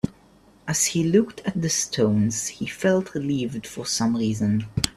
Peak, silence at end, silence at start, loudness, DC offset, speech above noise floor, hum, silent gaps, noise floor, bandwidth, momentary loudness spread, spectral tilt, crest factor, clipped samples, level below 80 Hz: -2 dBFS; 0.05 s; 0.05 s; -23 LUFS; under 0.1%; 31 dB; none; none; -54 dBFS; 14.5 kHz; 8 LU; -4.5 dB/octave; 22 dB; under 0.1%; -50 dBFS